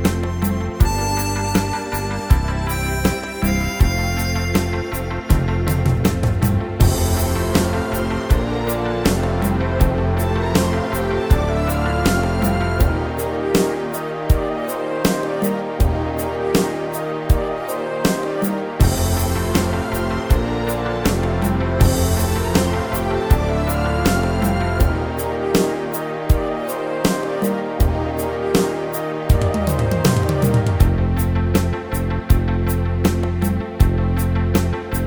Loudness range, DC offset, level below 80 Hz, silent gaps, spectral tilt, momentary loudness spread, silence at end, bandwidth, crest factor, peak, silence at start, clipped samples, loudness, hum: 2 LU; under 0.1%; -24 dBFS; none; -6 dB/octave; 5 LU; 0 s; over 20 kHz; 16 dB; -2 dBFS; 0 s; under 0.1%; -20 LUFS; none